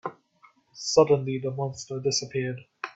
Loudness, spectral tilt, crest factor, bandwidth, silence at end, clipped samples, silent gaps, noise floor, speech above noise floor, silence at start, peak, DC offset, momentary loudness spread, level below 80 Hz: -26 LUFS; -4.5 dB/octave; 22 dB; 8.2 kHz; 0.05 s; under 0.1%; none; -60 dBFS; 35 dB; 0.05 s; -6 dBFS; under 0.1%; 14 LU; -66 dBFS